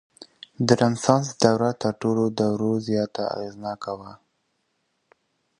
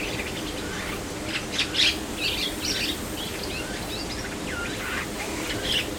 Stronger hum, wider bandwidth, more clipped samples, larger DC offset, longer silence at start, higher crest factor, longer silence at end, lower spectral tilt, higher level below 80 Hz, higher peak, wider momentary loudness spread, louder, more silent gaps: neither; second, 11 kHz vs 19 kHz; neither; neither; first, 0.2 s vs 0 s; about the same, 24 dB vs 22 dB; first, 1.45 s vs 0 s; first, -5.5 dB/octave vs -2.5 dB/octave; second, -60 dBFS vs -42 dBFS; first, -2 dBFS vs -8 dBFS; first, 13 LU vs 9 LU; first, -23 LUFS vs -27 LUFS; neither